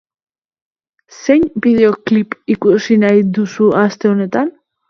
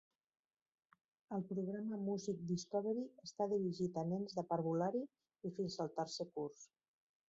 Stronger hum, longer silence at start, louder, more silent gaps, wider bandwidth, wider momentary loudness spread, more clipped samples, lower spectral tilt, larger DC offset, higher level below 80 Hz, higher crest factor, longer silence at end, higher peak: neither; about the same, 1.2 s vs 1.3 s; first, -13 LUFS vs -42 LUFS; neither; second, 6.8 kHz vs 8 kHz; about the same, 7 LU vs 9 LU; neither; about the same, -7 dB/octave vs -7 dB/octave; neither; first, -52 dBFS vs -82 dBFS; about the same, 14 dB vs 16 dB; second, 0.4 s vs 0.65 s; first, 0 dBFS vs -26 dBFS